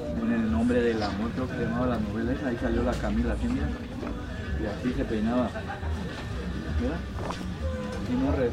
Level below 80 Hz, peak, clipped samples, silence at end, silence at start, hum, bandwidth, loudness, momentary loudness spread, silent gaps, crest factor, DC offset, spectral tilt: -36 dBFS; -12 dBFS; under 0.1%; 0 s; 0 s; none; 11.5 kHz; -29 LUFS; 8 LU; none; 16 dB; under 0.1%; -7.5 dB/octave